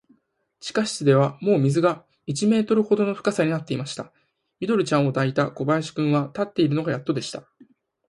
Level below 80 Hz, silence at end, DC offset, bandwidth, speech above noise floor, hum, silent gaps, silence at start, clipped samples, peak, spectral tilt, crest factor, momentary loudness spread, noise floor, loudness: -66 dBFS; 0.65 s; under 0.1%; 11.5 kHz; 45 dB; none; none; 0.65 s; under 0.1%; -6 dBFS; -6 dB/octave; 18 dB; 13 LU; -67 dBFS; -23 LUFS